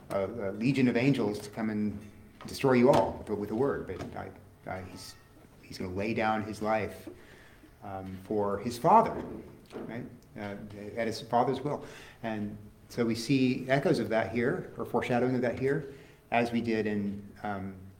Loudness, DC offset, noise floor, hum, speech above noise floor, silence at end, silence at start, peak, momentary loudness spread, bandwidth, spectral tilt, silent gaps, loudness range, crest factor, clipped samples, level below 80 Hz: -30 LUFS; under 0.1%; -54 dBFS; none; 24 dB; 0.05 s; 0 s; -8 dBFS; 18 LU; 17.5 kHz; -6.5 dB/octave; none; 7 LU; 22 dB; under 0.1%; -60 dBFS